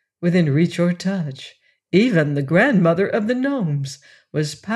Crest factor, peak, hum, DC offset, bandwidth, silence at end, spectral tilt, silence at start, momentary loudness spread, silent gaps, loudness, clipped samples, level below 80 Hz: 16 dB; -4 dBFS; none; under 0.1%; 11.5 kHz; 0 s; -7 dB/octave; 0.2 s; 14 LU; none; -19 LUFS; under 0.1%; -64 dBFS